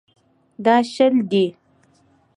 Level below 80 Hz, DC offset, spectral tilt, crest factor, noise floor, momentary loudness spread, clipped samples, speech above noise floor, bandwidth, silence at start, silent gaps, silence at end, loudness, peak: -70 dBFS; under 0.1%; -6 dB/octave; 18 dB; -58 dBFS; 6 LU; under 0.1%; 41 dB; 10.5 kHz; 0.6 s; none; 0.85 s; -18 LUFS; -4 dBFS